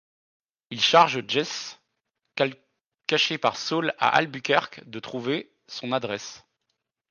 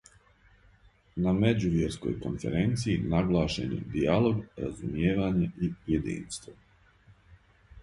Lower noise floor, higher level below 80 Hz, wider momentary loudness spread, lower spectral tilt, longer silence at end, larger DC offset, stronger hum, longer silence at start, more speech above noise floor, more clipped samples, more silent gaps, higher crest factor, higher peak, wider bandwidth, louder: first, -80 dBFS vs -61 dBFS; second, -74 dBFS vs -46 dBFS; first, 19 LU vs 10 LU; second, -3.5 dB/octave vs -7 dB/octave; first, 0.75 s vs 0 s; neither; neither; second, 0.7 s vs 1.15 s; first, 55 dB vs 32 dB; neither; neither; about the same, 22 dB vs 20 dB; first, -4 dBFS vs -10 dBFS; second, 10 kHz vs 11.5 kHz; first, -24 LUFS vs -29 LUFS